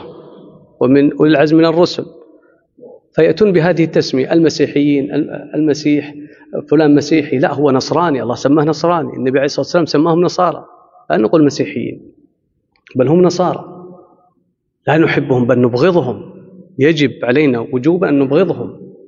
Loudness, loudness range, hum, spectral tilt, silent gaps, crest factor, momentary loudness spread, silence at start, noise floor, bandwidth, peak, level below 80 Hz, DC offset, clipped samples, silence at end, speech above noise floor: -13 LUFS; 3 LU; none; -5.5 dB/octave; none; 14 dB; 12 LU; 0 s; -63 dBFS; 7.4 kHz; 0 dBFS; -56 dBFS; under 0.1%; under 0.1%; 0.15 s; 51 dB